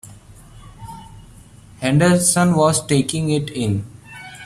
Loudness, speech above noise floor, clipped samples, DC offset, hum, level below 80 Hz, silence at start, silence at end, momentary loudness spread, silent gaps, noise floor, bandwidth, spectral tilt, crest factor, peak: -17 LUFS; 27 dB; under 0.1%; under 0.1%; none; -48 dBFS; 0.05 s; 0 s; 23 LU; none; -43 dBFS; 15 kHz; -5 dB/octave; 18 dB; -2 dBFS